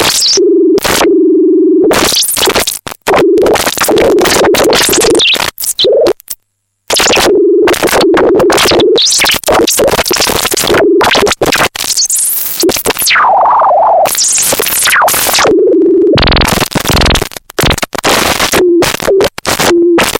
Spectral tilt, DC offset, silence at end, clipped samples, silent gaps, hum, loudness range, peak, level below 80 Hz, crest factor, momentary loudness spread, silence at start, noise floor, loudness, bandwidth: -2.5 dB/octave; under 0.1%; 0 s; under 0.1%; none; none; 2 LU; 0 dBFS; -26 dBFS; 8 dB; 4 LU; 0 s; -62 dBFS; -7 LUFS; 17 kHz